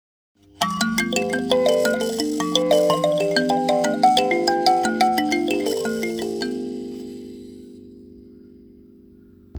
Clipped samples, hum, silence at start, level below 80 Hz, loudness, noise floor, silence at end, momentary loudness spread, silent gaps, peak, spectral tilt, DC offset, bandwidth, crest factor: under 0.1%; none; 0.6 s; -58 dBFS; -20 LUFS; -49 dBFS; 0 s; 15 LU; none; -2 dBFS; -3.5 dB/octave; under 0.1%; over 20 kHz; 20 dB